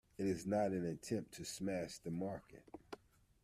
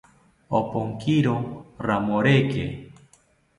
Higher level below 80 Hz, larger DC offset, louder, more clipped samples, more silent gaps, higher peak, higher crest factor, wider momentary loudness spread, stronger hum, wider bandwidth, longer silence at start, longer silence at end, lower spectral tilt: second, -70 dBFS vs -52 dBFS; neither; second, -42 LUFS vs -24 LUFS; neither; neither; second, -26 dBFS vs -6 dBFS; about the same, 18 dB vs 20 dB; first, 19 LU vs 13 LU; neither; first, 14.5 kHz vs 11 kHz; second, 0.2 s vs 0.5 s; second, 0.45 s vs 0.65 s; second, -5.5 dB/octave vs -7.5 dB/octave